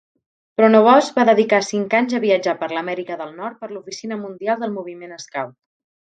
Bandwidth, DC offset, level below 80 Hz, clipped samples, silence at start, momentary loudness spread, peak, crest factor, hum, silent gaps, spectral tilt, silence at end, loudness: 9.2 kHz; under 0.1%; -72 dBFS; under 0.1%; 0.6 s; 17 LU; 0 dBFS; 18 dB; none; none; -5 dB/octave; 0.65 s; -18 LUFS